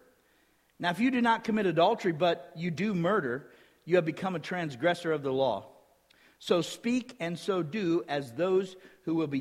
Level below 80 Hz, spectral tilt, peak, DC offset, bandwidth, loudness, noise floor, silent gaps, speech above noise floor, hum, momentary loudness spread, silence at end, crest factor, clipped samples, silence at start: -72 dBFS; -6 dB/octave; -12 dBFS; under 0.1%; 14.5 kHz; -30 LUFS; -68 dBFS; none; 38 dB; none; 10 LU; 0 s; 18 dB; under 0.1%; 0.8 s